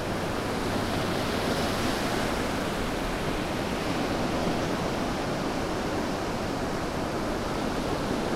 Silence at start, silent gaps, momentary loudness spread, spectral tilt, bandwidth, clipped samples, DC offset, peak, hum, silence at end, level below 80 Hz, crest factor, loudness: 0 s; none; 3 LU; -5 dB/octave; 16 kHz; under 0.1%; under 0.1%; -14 dBFS; none; 0 s; -40 dBFS; 14 dB; -29 LUFS